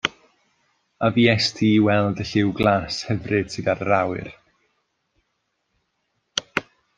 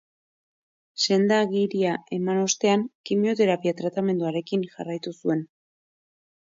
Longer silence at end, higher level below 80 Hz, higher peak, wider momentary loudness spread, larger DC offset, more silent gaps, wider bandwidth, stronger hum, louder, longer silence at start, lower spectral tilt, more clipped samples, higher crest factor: second, 0.35 s vs 1.05 s; first, -54 dBFS vs -74 dBFS; first, 0 dBFS vs -10 dBFS; about the same, 11 LU vs 9 LU; neither; second, none vs 2.95-3.04 s; first, 9.4 kHz vs 7.8 kHz; neither; first, -21 LUFS vs -24 LUFS; second, 0.05 s vs 0.95 s; about the same, -5.5 dB/octave vs -4.5 dB/octave; neither; first, 22 dB vs 16 dB